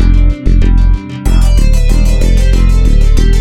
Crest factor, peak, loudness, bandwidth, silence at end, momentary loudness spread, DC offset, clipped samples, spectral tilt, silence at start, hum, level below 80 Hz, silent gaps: 6 dB; 0 dBFS; -11 LUFS; 10.5 kHz; 0 s; 2 LU; under 0.1%; under 0.1%; -6.5 dB/octave; 0 s; none; -6 dBFS; none